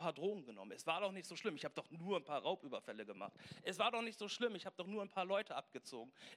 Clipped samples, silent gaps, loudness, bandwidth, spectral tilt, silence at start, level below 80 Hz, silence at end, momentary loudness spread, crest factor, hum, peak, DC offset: under 0.1%; none; -44 LUFS; 14.5 kHz; -4 dB/octave; 0 s; under -90 dBFS; 0 s; 12 LU; 22 dB; none; -24 dBFS; under 0.1%